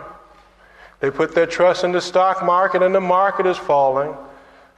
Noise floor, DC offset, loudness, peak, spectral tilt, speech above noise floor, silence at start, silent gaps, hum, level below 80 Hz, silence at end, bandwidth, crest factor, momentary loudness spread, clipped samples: -49 dBFS; under 0.1%; -17 LUFS; -4 dBFS; -5 dB/octave; 32 dB; 0 s; none; none; -56 dBFS; 0.45 s; 9.6 kHz; 16 dB; 8 LU; under 0.1%